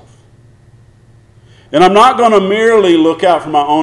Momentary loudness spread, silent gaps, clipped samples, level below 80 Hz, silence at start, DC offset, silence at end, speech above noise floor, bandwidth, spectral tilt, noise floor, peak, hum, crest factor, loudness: 6 LU; none; under 0.1%; -48 dBFS; 1.7 s; under 0.1%; 0 s; 35 dB; 12 kHz; -5 dB/octave; -44 dBFS; 0 dBFS; none; 12 dB; -9 LUFS